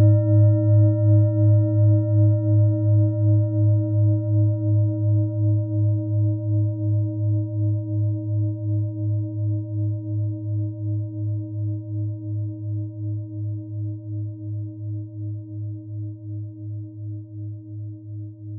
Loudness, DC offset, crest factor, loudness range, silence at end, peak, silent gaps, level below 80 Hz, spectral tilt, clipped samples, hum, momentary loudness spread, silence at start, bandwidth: -22 LUFS; under 0.1%; 14 dB; 14 LU; 0 s; -8 dBFS; none; -66 dBFS; -17.5 dB/octave; under 0.1%; none; 16 LU; 0 s; 1.4 kHz